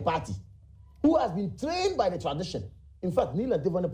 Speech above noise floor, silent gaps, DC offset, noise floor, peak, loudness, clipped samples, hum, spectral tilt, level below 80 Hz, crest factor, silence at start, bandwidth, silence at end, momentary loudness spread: 24 dB; none; under 0.1%; -52 dBFS; -12 dBFS; -29 LUFS; under 0.1%; none; -6.5 dB/octave; -50 dBFS; 18 dB; 0 s; 15.5 kHz; 0 s; 13 LU